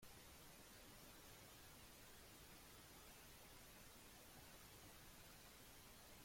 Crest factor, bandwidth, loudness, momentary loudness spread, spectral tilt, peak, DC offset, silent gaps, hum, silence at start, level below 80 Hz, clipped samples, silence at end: 14 dB; 16.5 kHz; -62 LUFS; 1 LU; -2.5 dB/octave; -50 dBFS; under 0.1%; none; none; 0 s; -72 dBFS; under 0.1%; 0 s